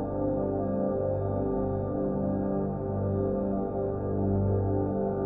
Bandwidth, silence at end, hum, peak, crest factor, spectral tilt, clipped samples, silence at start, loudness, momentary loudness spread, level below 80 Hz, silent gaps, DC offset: 2.4 kHz; 0 s; 50 Hz at -50 dBFS; -16 dBFS; 12 dB; -14.5 dB/octave; under 0.1%; 0 s; -29 LUFS; 3 LU; -44 dBFS; none; under 0.1%